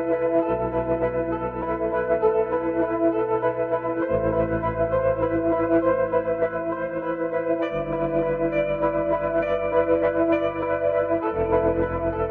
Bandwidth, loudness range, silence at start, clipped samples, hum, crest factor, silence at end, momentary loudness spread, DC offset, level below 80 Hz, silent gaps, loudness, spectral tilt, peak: 4.2 kHz; 2 LU; 0 s; under 0.1%; none; 16 dB; 0 s; 5 LU; under 0.1%; -44 dBFS; none; -23 LUFS; -10 dB/octave; -8 dBFS